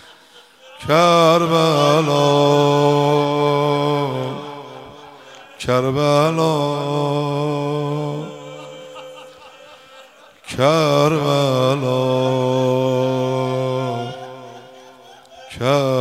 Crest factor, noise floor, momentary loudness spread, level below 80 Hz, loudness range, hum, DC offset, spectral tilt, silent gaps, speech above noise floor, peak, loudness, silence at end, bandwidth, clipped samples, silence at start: 16 dB; -47 dBFS; 20 LU; -58 dBFS; 8 LU; none; under 0.1%; -6 dB/octave; none; 32 dB; -2 dBFS; -17 LUFS; 0 s; 15.5 kHz; under 0.1%; 0.7 s